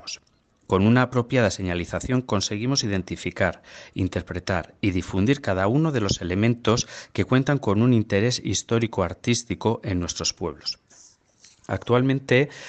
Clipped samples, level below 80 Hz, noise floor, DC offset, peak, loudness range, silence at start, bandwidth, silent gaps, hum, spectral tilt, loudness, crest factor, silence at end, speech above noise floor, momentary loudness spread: under 0.1%; -50 dBFS; -63 dBFS; under 0.1%; -6 dBFS; 4 LU; 0.05 s; 8.8 kHz; none; none; -5.5 dB/octave; -24 LUFS; 18 dB; 0 s; 40 dB; 10 LU